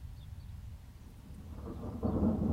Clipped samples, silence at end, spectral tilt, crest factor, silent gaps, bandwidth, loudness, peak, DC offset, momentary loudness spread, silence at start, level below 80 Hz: under 0.1%; 0 s; -9.5 dB/octave; 16 dB; none; 15.5 kHz; -38 LUFS; -20 dBFS; under 0.1%; 20 LU; 0 s; -46 dBFS